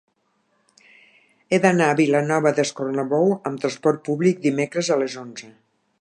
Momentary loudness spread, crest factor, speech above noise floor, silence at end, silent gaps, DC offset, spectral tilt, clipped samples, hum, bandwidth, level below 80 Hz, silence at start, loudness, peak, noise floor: 8 LU; 20 dB; 47 dB; 0.5 s; none; under 0.1%; -5.5 dB/octave; under 0.1%; none; 11.5 kHz; -72 dBFS; 1.5 s; -21 LUFS; -2 dBFS; -68 dBFS